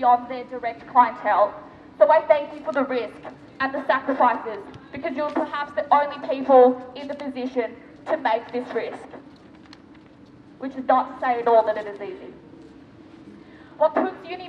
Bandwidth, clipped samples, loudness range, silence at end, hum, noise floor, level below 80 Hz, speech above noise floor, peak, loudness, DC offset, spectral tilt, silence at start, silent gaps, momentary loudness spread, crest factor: 6.8 kHz; under 0.1%; 8 LU; 0 s; none; -48 dBFS; -64 dBFS; 26 dB; -4 dBFS; -22 LUFS; under 0.1%; -6 dB/octave; 0 s; none; 18 LU; 20 dB